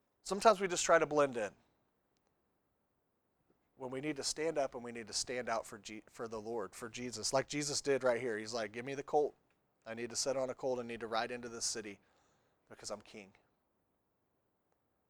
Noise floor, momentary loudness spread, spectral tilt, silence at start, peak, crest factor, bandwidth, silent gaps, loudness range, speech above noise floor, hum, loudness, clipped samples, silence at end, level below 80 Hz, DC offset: -81 dBFS; 18 LU; -2.5 dB/octave; 0.25 s; -12 dBFS; 26 dB; over 20 kHz; none; 7 LU; 44 dB; none; -37 LUFS; under 0.1%; 1.8 s; -72 dBFS; under 0.1%